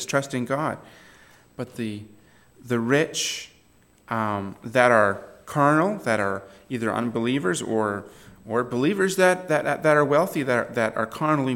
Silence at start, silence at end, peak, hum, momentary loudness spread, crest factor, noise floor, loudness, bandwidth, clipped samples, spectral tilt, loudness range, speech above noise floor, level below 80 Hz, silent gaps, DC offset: 0 s; 0 s; -2 dBFS; none; 14 LU; 22 dB; -58 dBFS; -23 LUFS; 17 kHz; under 0.1%; -5 dB/octave; 6 LU; 35 dB; -64 dBFS; none; under 0.1%